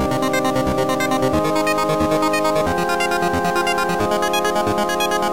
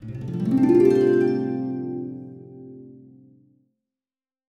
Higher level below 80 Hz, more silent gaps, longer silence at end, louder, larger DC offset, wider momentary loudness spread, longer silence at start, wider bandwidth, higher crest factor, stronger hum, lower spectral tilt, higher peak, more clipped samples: first, -40 dBFS vs -60 dBFS; neither; second, 0 s vs 1.5 s; first, -18 LUFS vs -21 LUFS; first, 0.4% vs under 0.1%; second, 1 LU vs 26 LU; about the same, 0 s vs 0 s; first, 17 kHz vs 8 kHz; second, 12 dB vs 18 dB; neither; second, -4.5 dB/octave vs -9 dB/octave; about the same, -6 dBFS vs -6 dBFS; neither